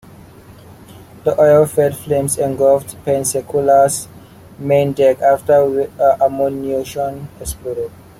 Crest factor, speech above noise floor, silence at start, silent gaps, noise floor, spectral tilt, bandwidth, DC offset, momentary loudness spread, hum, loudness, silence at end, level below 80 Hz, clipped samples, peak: 14 dB; 25 dB; 0.5 s; none; -40 dBFS; -5.5 dB/octave; 16 kHz; under 0.1%; 13 LU; none; -15 LUFS; 0.3 s; -46 dBFS; under 0.1%; -2 dBFS